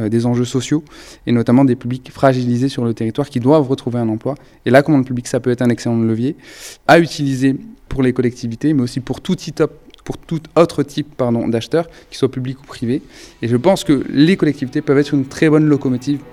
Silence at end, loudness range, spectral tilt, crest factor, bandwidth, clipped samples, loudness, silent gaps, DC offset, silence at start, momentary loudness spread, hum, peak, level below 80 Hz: 0 s; 4 LU; -6.5 dB/octave; 16 dB; 14.5 kHz; under 0.1%; -16 LUFS; none; under 0.1%; 0 s; 12 LU; none; 0 dBFS; -44 dBFS